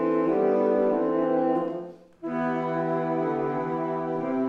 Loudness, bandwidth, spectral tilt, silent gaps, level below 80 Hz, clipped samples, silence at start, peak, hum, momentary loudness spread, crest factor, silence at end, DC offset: -26 LUFS; 6 kHz; -9.5 dB/octave; none; -72 dBFS; under 0.1%; 0 s; -12 dBFS; none; 10 LU; 14 dB; 0 s; under 0.1%